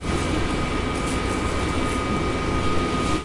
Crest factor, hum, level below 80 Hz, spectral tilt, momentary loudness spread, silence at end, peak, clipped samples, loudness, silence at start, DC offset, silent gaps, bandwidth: 16 dB; none; -32 dBFS; -5 dB/octave; 1 LU; 0 s; -8 dBFS; under 0.1%; -24 LUFS; 0 s; under 0.1%; none; 11.5 kHz